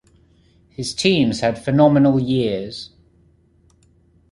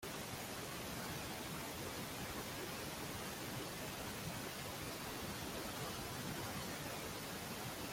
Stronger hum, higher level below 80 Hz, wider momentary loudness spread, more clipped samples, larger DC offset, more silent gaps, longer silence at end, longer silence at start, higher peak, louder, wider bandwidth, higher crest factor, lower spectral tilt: neither; first, -50 dBFS vs -64 dBFS; first, 19 LU vs 1 LU; neither; neither; neither; first, 1.45 s vs 0 s; first, 0.8 s vs 0 s; first, -2 dBFS vs -32 dBFS; first, -18 LUFS vs -45 LUFS; second, 11.5 kHz vs 16.5 kHz; about the same, 18 dB vs 14 dB; first, -6 dB/octave vs -3.5 dB/octave